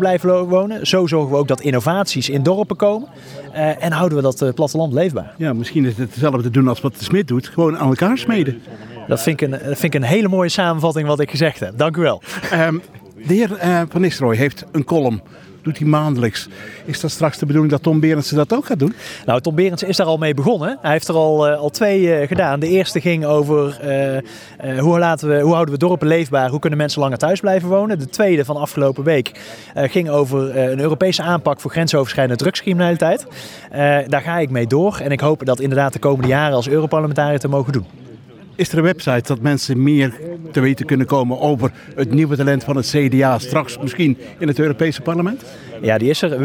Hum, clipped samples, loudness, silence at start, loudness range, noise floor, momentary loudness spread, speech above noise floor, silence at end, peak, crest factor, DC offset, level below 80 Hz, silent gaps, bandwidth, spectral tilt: none; under 0.1%; -17 LUFS; 0 s; 2 LU; -39 dBFS; 7 LU; 23 dB; 0 s; -2 dBFS; 16 dB; under 0.1%; -54 dBFS; none; over 20 kHz; -6.5 dB/octave